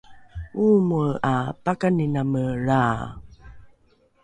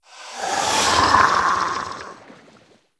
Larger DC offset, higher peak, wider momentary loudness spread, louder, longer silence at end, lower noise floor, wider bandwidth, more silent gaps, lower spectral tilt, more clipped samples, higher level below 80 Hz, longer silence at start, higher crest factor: neither; second, -8 dBFS vs 0 dBFS; second, 15 LU vs 20 LU; second, -22 LUFS vs -18 LUFS; about the same, 0.6 s vs 0.65 s; first, -61 dBFS vs -53 dBFS; about the same, 10 kHz vs 11 kHz; neither; first, -8.5 dB/octave vs -1.5 dB/octave; neither; about the same, -46 dBFS vs -48 dBFS; about the same, 0.1 s vs 0.15 s; second, 16 dB vs 22 dB